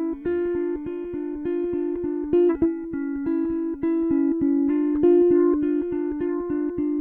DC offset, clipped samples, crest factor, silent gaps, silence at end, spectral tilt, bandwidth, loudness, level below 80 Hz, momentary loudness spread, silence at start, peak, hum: under 0.1%; under 0.1%; 14 dB; none; 0 s; -11 dB/octave; 3 kHz; -23 LUFS; -50 dBFS; 10 LU; 0 s; -10 dBFS; none